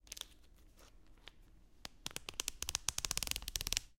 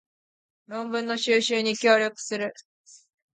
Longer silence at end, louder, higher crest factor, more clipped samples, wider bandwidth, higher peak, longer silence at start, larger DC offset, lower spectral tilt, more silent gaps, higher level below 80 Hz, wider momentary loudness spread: second, 0.05 s vs 0.4 s; second, -40 LUFS vs -24 LUFS; first, 34 dB vs 20 dB; neither; first, 17 kHz vs 9.4 kHz; about the same, -10 dBFS vs -8 dBFS; second, 0.05 s vs 0.7 s; neither; second, 0 dB/octave vs -2.5 dB/octave; second, none vs 2.65-2.84 s; first, -54 dBFS vs -78 dBFS; first, 22 LU vs 13 LU